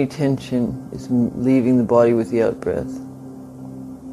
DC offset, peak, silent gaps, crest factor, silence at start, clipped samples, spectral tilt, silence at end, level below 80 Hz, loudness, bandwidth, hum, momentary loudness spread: under 0.1%; -2 dBFS; none; 18 dB; 0 s; under 0.1%; -8 dB/octave; 0 s; -50 dBFS; -19 LUFS; 12 kHz; none; 20 LU